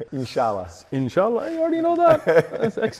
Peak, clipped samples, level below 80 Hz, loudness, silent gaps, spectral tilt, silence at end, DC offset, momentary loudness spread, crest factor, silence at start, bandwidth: -6 dBFS; under 0.1%; -60 dBFS; -21 LUFS; none; -7 dB/octave; 0 s; under 0.1%; 10 LU; 16 dB; 0 s; 13.5 kHz